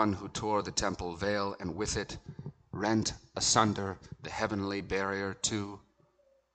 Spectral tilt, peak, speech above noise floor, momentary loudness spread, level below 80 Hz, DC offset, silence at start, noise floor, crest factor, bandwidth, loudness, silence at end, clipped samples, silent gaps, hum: -3.5 dB/octave; -10 dBFS; 36 dB; 17 LU; -54 dBFS; under 0.1%; 0 s; -69 dBFS; 24 dB; 9.4 kHz; -32 LUFS; 0.75 s; under 0.1%; none; none